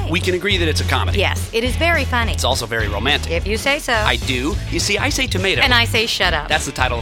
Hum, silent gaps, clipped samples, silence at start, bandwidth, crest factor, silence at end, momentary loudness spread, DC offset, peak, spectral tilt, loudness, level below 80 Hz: none; none; under 0.1%; 0 s; 17.5 kHz; 18 dB; 0 s; 6 LU; under 0.1%; 0 dBFS; -3.5 dB/octave; -17 LUFS; -28 dBFS